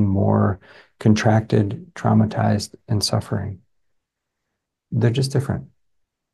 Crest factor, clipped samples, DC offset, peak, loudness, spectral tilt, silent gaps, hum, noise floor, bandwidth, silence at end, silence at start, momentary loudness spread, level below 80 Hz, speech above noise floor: 18 dB; under 0.1%; under 0.1%; -4 dBFS; -21 LUFS; -6.5 dB/octave; none; none; -80 dBFS; 12.5 kHz; 0.7 s; 0 s; 10 LU; -54 dBFS; 60 dB